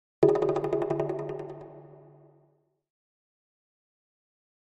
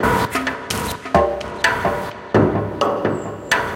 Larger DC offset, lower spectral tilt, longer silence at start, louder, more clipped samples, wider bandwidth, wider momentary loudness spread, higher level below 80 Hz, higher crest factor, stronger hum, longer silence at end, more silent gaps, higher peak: neither; first, -8.5 dB/octave vs -5 dB/octave; first, 0.2 s vs 0 s; second, -28 LUFS vs -20 LUFS; neither; second, 8.2 kHz vs 17 kHz; first, 22 LU vs 6 LU; second, -64 dBFS vs -38 dBFS; first, 26 dB vs 18 dB; neither; first, 2.65 s vs 0 s; neither; second, -6 dBFS vs -2 dBFS